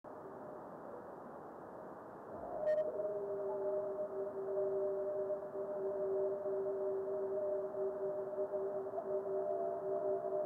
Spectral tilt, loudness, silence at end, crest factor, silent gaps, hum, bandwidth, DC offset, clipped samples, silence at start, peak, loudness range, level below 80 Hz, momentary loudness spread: -9 dB/octave; -40 LUFS; 0 s; 12 dB; none; none; 3.3 kHz; under 0.1%; under 0.1%; 0.05 s; -28 dBFS; 3 LU; -80 dBFS; 13 LU